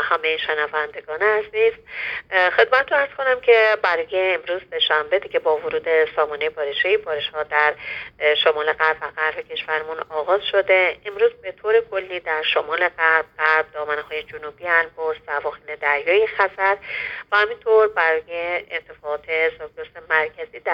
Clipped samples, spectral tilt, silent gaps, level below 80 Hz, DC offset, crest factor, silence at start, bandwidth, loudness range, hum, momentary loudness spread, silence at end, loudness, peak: under 0.1%; -4 dB/octave; none; -60 dBFS; under 0.1%; 20 dB; 0 s; 6 kHz; 3 LU; none; 11 LU; 0 s; -20 LUFS; -2 dBFS